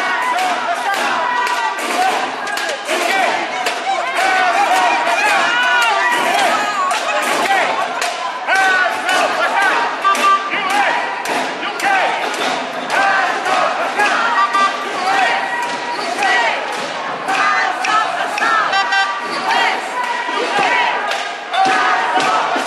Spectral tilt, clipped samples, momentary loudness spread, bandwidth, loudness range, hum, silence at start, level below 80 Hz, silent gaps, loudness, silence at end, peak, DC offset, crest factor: -1 dB/octave; under 0.1%; 6 LU; 14 kHz; 3 LU; none; 0 s; -70 dBFS; none; -15 LUFS; 0 s; -2 dBFS; under 0.1%; 14 dB